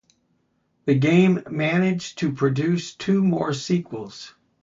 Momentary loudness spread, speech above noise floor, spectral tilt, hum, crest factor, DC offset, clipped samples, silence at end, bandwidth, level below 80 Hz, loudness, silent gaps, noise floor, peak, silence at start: 16 LU; 47 dB; -6.5 dB/octave; none; 18 dB; under 0.1%; under 0.1%; 0.35 s; 7.6 kHz; -62 dBFS; -22 LUFS; none; -68 dBFS; -6 dBFS; 0.85 s